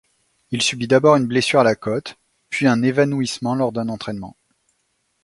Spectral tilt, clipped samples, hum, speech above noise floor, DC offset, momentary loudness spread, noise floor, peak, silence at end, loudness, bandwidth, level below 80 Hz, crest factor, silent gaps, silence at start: -5 dB/octave; under 0.1%; none; 51 dB; under 0.1%; 14 LU; -69 dBFS; 0 dBFS; 0.95 s; -19 LUFS; 11.5 kHz; -58 dBFS; 20 dB; none; 0.5 s